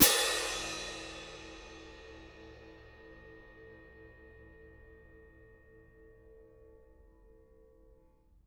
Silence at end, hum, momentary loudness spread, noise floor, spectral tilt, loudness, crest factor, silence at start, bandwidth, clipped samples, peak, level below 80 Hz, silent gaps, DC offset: 3.75 s; none; 26 LU; -64 dBFS; -1 dB/octave; -33 LUFS; 32 dB; 0 s; over 20 kHz; under 0.1%; -6 dBFS; -58 dBFS; none; under 0.1%